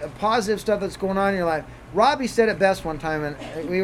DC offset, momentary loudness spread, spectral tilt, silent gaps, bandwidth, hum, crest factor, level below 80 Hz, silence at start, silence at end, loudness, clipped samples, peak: under 0.1%; 9 LU; -5 dB/octave; none; 15 kHz; none; 18 dB; -46 dBFS; 0 s; 0 s; -23 LUFS; under 0.1%; -6 dBFS